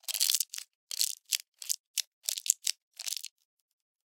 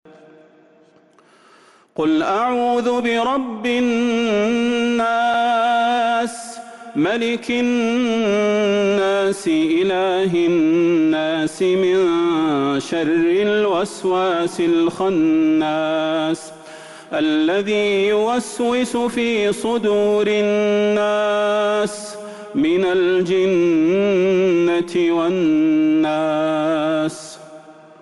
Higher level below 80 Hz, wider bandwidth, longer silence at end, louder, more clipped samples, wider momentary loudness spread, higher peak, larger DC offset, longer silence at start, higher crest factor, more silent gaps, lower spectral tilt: second, under -90 dBFS vs -58 dBFS; first, 17 kHz vs 11.5 kHz; first, 0.8 s vs 0.3 s; second, -32 LUFS vs -18 LUFS; neither; first, 12 LU vs 6 LU; first, -2 dBFS vs -10 dBFS; neither; second, 0.1 s vs 2 s; first, 34 dB vs 8 dB; first, 0.75-0.87 s, 1.48-1.52 s, 1.80-1.94 s, 2.07-2.22 s, 2.82-2.91 s vs none; second, 10.5 dB/octave vs -5 dB/octave